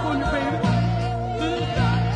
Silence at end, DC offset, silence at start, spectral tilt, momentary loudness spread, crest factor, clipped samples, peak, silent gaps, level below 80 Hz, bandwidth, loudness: 0 s; under 0.1%; 0 s; -7 dB/octave; 4 LU; 12 dB; under 0.1%; -10 dBFS; none; -34 dBFS; 9.8 kHz; -23 LUFS